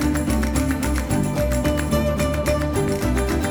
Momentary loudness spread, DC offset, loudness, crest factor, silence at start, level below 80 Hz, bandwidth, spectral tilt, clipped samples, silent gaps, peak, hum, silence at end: 1 LU; under 0.1%; -21 LUFS; 14 dB; 0 s; -26 dBFS; over 20 kHz; -6 dB/octave; under 0.1%; none; -6 dBFS; none; 0 s